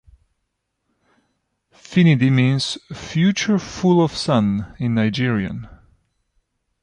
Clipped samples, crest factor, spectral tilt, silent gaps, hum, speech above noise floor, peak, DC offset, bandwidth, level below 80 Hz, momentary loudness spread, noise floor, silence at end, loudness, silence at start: under 0.1%; 16 dB; -6 dB/octave; none; none; 57 dB; -4 dBFS; under 0.1%; 10.5 kHz; -50 dBFS; 10 LU; -75 dBFS; 1.15 s; -19 LUFS; 1.9 s